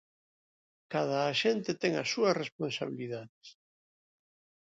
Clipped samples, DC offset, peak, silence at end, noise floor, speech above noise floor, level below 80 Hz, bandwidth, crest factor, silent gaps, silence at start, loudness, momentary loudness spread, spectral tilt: under 0.1%; under 0.1%; -14 dBFS; 1.15 s; under -90 dBFS; over 58 dB; -80 dBFS; 7.8 kHz; 20 dB; 2.52-2.59 s, 3.29-3.41 s; 0.9 s; -32 LUFS; 11 LU; -4.5 dB/octave